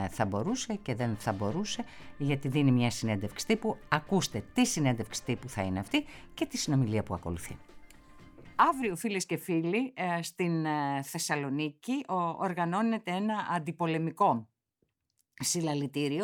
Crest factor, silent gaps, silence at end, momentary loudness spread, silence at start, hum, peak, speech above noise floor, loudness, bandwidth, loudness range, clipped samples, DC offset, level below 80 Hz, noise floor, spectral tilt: 22 dB; none; 0 s; 8 LU; 0 s; none; -8 dBFS; 48 dB; -31 LUFS; 19 kHz; 2 LU; under 0.1%; under 0.1%; -58 dBFS; -79 dBFS; -5 dB/octave